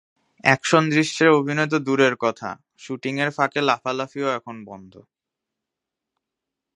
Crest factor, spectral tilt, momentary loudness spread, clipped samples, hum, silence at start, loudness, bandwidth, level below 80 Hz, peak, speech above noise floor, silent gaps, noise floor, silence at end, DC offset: 22 dB; -5 dB/octave; 17 LU; under 0.1%; none; 0.45 s; -21 LUFS; 11 kHz; -70 dBFS; 0 dBFS; 63 dB; none; -85 dBFS; 1.75 s; under 0.1%